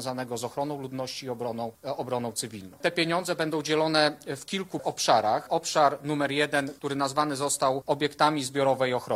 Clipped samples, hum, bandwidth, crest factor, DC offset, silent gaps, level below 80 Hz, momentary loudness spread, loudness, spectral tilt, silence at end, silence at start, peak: under 0.1%; none; 16 kHz; 20 dB; under 0.1%; none; -68 dBFS; 10 LU; -27 LUFS; -3.5 dB/octave; 0 s; 0 s; -6 dBFS